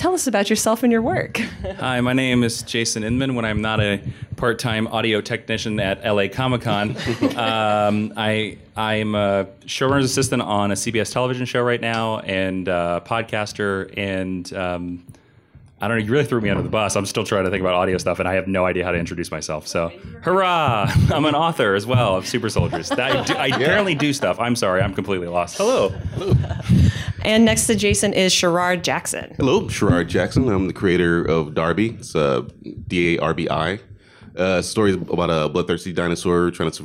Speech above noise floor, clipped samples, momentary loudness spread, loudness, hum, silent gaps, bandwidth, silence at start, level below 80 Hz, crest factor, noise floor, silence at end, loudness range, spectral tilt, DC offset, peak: 29 dB; under 0.1%; 8 LU; -20 LUFS; none; none; 16 kHz; 0 s; -42 dBFS; 14 dB; -49 dBFS; 0 s; 4 LU; -5 dB/octave; under 0.1%; -6 dBFS